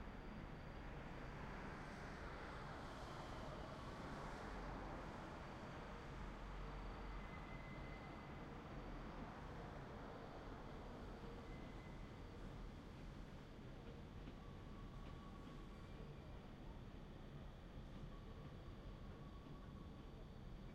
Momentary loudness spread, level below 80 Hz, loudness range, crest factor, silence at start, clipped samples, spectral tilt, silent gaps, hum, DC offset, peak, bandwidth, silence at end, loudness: 5 LU; -58 dBFS; 5 LU; 16 dB; 0 s; under 0.1%; -6.5 dB/octave; none; none; under 0.1%; -38 dBFS; 13.5 kHz; 0 s; -55 LUFS